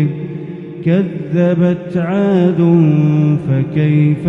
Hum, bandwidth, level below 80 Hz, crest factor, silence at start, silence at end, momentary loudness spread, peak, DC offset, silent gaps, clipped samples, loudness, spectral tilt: none; 4 kHz; -52 dBFS; 12 dB; 0 s; 0 s; 11 LU; 0 dBFS; under 0.1%; none; under 0.1%; -14 LUFS; -10.5 dB/octave